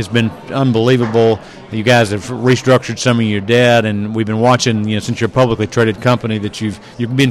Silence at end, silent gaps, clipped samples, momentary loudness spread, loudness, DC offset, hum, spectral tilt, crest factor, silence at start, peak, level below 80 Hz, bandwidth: 0 s; none; under 0.1%; 8 LU; -14 LUFS; under 0.1%; none; -5.5 dB/octave; 12 dB; 0 s; -2 dBFS; -46 dBFS; 13 kHz